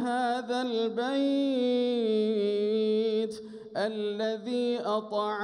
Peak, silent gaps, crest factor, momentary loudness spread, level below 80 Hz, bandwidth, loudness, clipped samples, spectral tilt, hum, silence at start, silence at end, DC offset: -16 dBFS; none; 12 dB; 5 LU; -78 dBFS; 11 kHz; -29 LUFS; under 0.1%; -5.5 dB/octave; none; 0 s; 0 s; under 0.1%